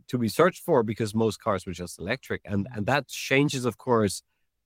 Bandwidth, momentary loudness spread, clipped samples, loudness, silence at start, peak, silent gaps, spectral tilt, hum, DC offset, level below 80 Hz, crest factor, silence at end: 16.5 kHz; 8 LU; under 0.1%; -26 LUFS; 0.1 s; -6 dBFS; none; -5.5 dB/octave; none; under 0.1%; -62 dBFS; 20 dB; 0.45 s